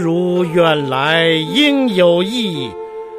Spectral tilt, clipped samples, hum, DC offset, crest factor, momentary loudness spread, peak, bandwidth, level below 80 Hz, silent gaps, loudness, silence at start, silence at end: -5.5 dB/octave; under 0.1%; none; under 0.1%; 14 dB; 9 LU; 0 dBFS; 15.5 kHz; -58 dBFS; none; -14 LUFS; 0 s; 0 s